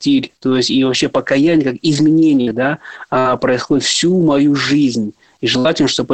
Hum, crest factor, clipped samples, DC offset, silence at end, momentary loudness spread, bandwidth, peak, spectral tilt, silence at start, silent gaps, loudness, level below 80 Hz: none; 10 dB; under 0.1%; 0.2%; 0 s; 6 LU; 9 kHz; -4 dBFS; -4.5 dB/octave; 0 s; none; -14 LUFS; -52 dBFS